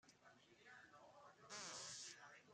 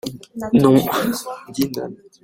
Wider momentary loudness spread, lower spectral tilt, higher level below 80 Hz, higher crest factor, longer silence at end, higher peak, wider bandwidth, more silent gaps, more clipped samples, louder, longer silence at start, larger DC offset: about the same, 18 LU vs 17 LU; second, -0.5 dB/octave vs -6 dB/octave; second, under -90 dBFS vs -52 dBFS; about the same, 20 dB vs 18 dB; second, 0 s vs 0.3 s; second, -40 dBFS vs -2 dBFS; second, 13 kHz vs 16.5 kHz; neither; neither; second, -56 LUFS vs -18 LUFS; about the same, 0.05 s vs 0.05 s; neither